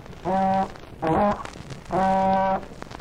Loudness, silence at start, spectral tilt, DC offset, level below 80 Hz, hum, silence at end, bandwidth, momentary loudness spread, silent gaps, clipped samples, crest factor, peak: -24 LUFS; 0 s; -7 dB/octave; under 0.1%; -44 dBFS; none; 0 s; 11.5 kHz; 13 LU; none; under 0.1%; 14 dB; -10 dBFS